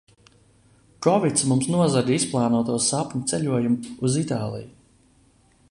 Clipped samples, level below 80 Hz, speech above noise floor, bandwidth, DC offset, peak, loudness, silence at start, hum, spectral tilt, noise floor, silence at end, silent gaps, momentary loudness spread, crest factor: under 0.1%; -58 dBFS; 36 dB; 11.5 kHz; under 0.1%; -4 dBFS; -22 LUFS; 1 s; none; -5 dB/octave; -59 dBFS; 1 s; none; 6 LU; 20 dB